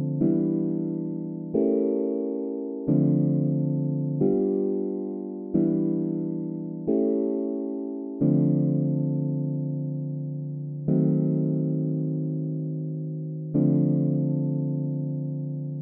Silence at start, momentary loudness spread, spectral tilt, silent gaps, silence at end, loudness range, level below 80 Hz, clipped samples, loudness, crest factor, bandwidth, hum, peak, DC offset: 0 s; 9 LU; -16 dB/octave; none; 0 s; 2 LU; -64 dBFS; under 0.1%; -26 LUFS; 16 dB; 1.5 kHz; none; -10 dBFS; under 0.1%